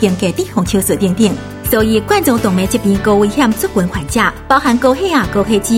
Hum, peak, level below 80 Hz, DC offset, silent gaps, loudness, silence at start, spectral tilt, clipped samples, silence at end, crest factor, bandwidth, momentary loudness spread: none; 0 dBFS; -32 dBFS; under 0.1%; none; -13 LUFS; 0 s; -5 dB/octave; under 0.1%; 0 s; 12 dB; 17 kHz; 4 LU